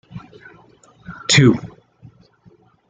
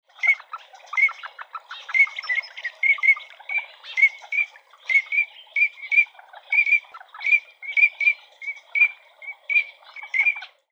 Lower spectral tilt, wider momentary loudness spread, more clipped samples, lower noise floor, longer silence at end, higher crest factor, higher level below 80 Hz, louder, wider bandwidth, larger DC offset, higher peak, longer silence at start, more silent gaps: first, -4.5 dB/octave vs 5.5 dB/octave; first, 26 LU vs 19 LU; neither; first, -53 dBFS vs -42 dBFS; first, 1.25 s vs 0.25 s; about the same, 20 dB vs 16 dB; first, -52 dBFS vs under -90 dBFS; first, -15 LUFS vs -20 LUFS; first, 9.6 kHz vs 7.6 kHz; neither; first, -2 dBFS vs -6 dBFS; about the same, 0.15 s vs 0.2 s; neither